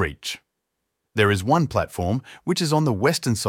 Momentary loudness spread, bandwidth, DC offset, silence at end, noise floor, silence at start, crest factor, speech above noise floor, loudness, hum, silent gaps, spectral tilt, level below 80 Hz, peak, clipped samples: 11 LU; 17 kHz; under 0.1%; 0 s; -79 dBFS; 0 s; 18 dB; 57 dB; -22 LUFS; none; none; -5 dB/octave; -48 dBFS; -4 dBFS; under 0.1%